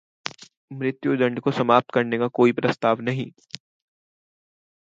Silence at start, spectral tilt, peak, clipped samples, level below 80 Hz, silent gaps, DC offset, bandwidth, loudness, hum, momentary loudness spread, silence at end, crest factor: 0.25 s; -6.5 dB/octave; -2 dBFS; under 0.1%; -68 dBFS; 0.57-0.68 s; under 0.1%; 7.8 kHz; -22 LUFS; none; 19 LU; 1.35 s; 22 dB